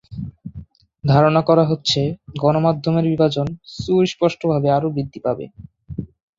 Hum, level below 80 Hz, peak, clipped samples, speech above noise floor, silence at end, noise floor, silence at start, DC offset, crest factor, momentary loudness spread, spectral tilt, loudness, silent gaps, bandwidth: none; -48 dBFS; -2 dBFS; under 0.1%; 22 dB; 0.35 s; -40 dBFS; 0.1 s; under 0.1%; 18 dB; 18 LU; -7 dB/octave; -18 LUFS; none; 7.8 kHz